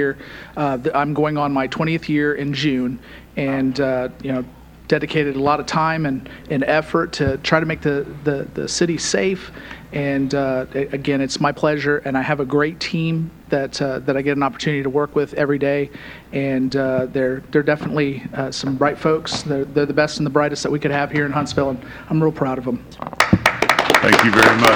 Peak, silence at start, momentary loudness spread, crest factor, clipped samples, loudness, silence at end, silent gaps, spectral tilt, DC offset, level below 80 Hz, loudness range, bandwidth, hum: 0 dBFS; 0 s; 8 LU; 18 dB; under 0.1%; -19 LUFS; 0 s; none; -5 dB/octave; under 0.1%; -46 dBFS; 2 LU; over 20 kHz; none